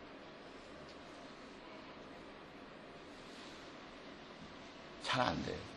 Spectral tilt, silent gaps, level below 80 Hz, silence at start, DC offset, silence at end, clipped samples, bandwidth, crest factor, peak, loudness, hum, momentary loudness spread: -4.5 dB/octave; none; -66 dBFS; 0 s; under 0.1%; 0 s; under 0.1%; 11.5 kHz; 30 dB; -16 dBFS; -46 LUFS; none; 17 LU